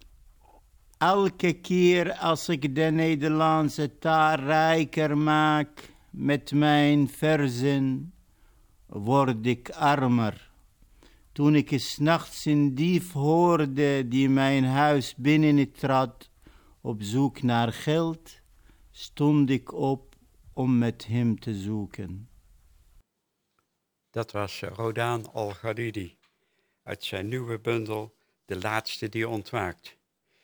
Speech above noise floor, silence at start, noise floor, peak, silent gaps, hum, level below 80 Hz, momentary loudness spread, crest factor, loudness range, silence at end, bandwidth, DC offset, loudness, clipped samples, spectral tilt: 54 dB; 1 s; -79 dBFS; -8 dBFS; none; none; -58 dBFS; 13 LU; 18 dB; 10 LU; 0.55 s; over 20 kHz; under 0.1%; -25 LUFS; under 0.1%; -6.5 dB/octave